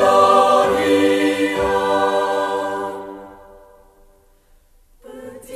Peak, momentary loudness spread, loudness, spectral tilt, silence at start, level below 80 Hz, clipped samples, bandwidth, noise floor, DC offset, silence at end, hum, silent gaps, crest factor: -2 dBFS; 24 LU; -16 LUFS; -4 dB/octave; 0 s; -48 dBFS; under 0.1%; 14 kHz; -53 dBFS; under 0.1%; 0 s; none; none; 16 dB